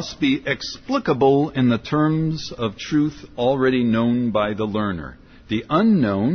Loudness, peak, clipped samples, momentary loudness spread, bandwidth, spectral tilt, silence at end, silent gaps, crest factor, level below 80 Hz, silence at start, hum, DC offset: -20 LUFS; -6 dBFS; under 0.1%; 9 LU; 6.6 kHz; -7 dB/octave; 0 s; none; 14 dB; -48 dBFS; 0 s; none; under 0.1%